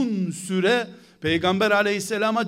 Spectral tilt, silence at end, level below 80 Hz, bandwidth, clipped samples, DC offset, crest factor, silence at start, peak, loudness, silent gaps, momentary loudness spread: -4.5 dB/octave; 0 s; -60 dBFS; 15.5 kHz; under 0.1%; under 0.1%; 16 dB; 0 s; -6 dBFS; -22 LUFS; none; 8 LU